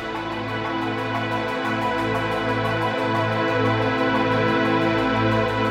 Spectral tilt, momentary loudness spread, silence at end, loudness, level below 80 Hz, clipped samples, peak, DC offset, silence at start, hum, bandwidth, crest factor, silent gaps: -6.5 dB/octave; 5 LU; 0 s; -22 LUFS; -46 dBFS; under 0.1%; -8 dBFS; under 0.1%; 0 s; none; 14.5 kHz; 14 dB; none